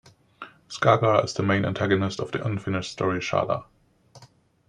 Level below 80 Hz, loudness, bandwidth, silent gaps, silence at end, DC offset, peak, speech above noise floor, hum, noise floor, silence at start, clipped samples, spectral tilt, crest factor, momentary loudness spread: -58 dBFS; -24 LUFS; 10.5 kHz; none; 0.45 s; under 0.1%; -4 dBFS; 32 dB; none; -55 dBFS; 0.4 s; under 0.1%; -6 dB/octave; 22 dB; 15 LU